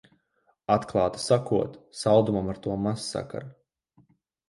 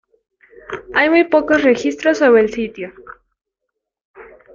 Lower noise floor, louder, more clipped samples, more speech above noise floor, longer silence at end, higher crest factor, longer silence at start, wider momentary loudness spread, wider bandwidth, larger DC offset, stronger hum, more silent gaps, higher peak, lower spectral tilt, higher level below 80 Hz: second, -70 dBFS vs -78 dBFS; second, -26 LUFS vs -14 LUFS; neither; second, 44 dB vs 64 dB; first, 1 s vs 0.3 s; about the same, 20 dB vs 16 dB; about the same, 0.7 s vs 0.7 s; second, 16 LU vs 19 LU; first, 11.5 kHz vs 7.6 kHz; neither; neither; second, none vs 4.01-4.14 s; second, -6 dBFS vs -2 dBFS; first, -6 dB/octave vs -4.5 dB/octave; about the same, -54 dBFS vs -52 dBFS